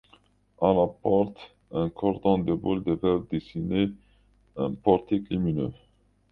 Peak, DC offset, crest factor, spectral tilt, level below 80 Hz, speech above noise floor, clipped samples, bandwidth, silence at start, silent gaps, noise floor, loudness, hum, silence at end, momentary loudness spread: -6 dBFS; under 0.1%; 22 dB; -10.5 dB/octave; -50 dBFS; 36 dB; under 0.1%; 4.8 kHz; 0.6 s; none; -61 dBFS; -27 LUFS; 50 Hz at -45 dBFS; 0.55 s; 8 LU